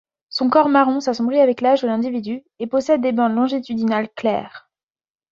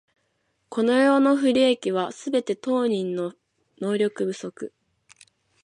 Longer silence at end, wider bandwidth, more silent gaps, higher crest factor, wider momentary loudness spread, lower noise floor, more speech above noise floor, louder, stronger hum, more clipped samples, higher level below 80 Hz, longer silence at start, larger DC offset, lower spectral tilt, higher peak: second, 0.75 s vs 0.95 s; second, 7.6 kHz vs 11 kHz; neither; about the same, 18 dB vs 16 dB; second, 11 LU vs 15 LU; first, under -90 dBFS vs -72 dBFS; first, over 72 dB vs 50 dB; first, -19 LUFS vs -23 LUFS; neither; neither; first, -64 dBFS vs -74 dBFS; second, 0.3 s vs 0.7 s; neither; about the same, -5.5 dB/octave vs -5 dB/octave; first, -2 dBFS vs -8 dBFS